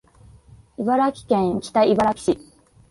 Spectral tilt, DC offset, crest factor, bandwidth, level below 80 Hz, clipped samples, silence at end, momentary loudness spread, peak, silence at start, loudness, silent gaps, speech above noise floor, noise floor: -6 dB/octave; under 0.1%; 18 dB; 11.5 kHz; -52 dBFS; under 0.1%; 0.55 s; 8 LU; -4 dBFS; 0.8 s; -21 LUFS; none; 30 dB; -49 dBFS